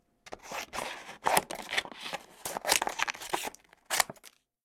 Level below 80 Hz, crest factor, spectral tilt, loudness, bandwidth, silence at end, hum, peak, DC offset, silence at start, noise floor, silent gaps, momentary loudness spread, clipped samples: -64 dBFS; 30 dB; -0.5 dB/octave; -32 LUFS; 19.5 kHz; 0.35 s; none; -4 dBFS; under 0.1%; 0.25 s; -58 dBFS; none; 13 LU; under 0.1%